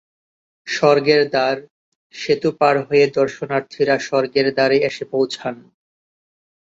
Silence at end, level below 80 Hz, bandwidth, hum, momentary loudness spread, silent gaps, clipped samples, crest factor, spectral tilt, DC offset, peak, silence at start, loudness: 1.1 s; -62 dBFS; 7.8 kHz; none; 11 LU; 1.70-2.10 s; under 0.1%; 18 dB; -5 dB/octave; under 0.1%; -2 dBFS; 0.65 s; -18 LUFS